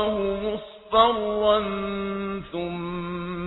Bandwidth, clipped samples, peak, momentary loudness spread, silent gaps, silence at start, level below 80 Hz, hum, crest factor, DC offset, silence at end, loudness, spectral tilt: 4.1 kHz; under 0.1%; -6 dBFS; 11 LU; none; 0 s; -48 dBFS; none; 20 dB; under 0.1%; 0 s; -25 LUFS; -9 dB/octave